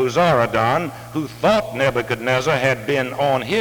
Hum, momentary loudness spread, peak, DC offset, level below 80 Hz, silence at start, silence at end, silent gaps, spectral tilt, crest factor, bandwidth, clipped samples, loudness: none; 6 LU; -4 dBFS; under 0.1%; -48 dBFS; 0 s; 0 s; none; -5.5 dB/octave; 16 dB; over 20 kHz; under 0.1%; -19 LUFS